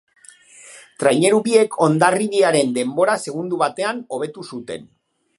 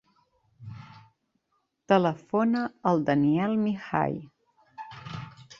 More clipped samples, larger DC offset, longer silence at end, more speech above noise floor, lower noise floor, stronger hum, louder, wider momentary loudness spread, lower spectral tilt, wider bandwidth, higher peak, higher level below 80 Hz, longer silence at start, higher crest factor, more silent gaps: neither; neither; first, 0.55 s vs 0.15 s; second, 28 dB vs 51 dB; second, -46 dBFS vs -76 dBFS; neither; first, -18 LUFS vs -26 LUFS; second, 15 LU vs 21 LU; second, -4.5 dB/octave vs -8 dB/octave; first, 11.5 kHz vs 7.2 kHz; first, 0 dBFS vs -8 dBFS; about the same, -68 dBFS vs -64 dBFS; about the same, 0.65 s vs 0.6 s; about the same, 18 dB vs 22 dB; neither